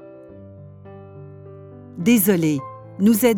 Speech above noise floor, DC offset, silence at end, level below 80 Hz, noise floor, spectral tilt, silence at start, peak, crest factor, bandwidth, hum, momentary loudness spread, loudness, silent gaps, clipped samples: 24 dB; under 0.1%; 0 s; -66 dBFS; -41 dBFS; -5.5 dB/octave; 0.05 s; -4 dBFS; 18 dB; 18.5 kHz; none; 26 LU; -19 LUFS; none; under 0.1%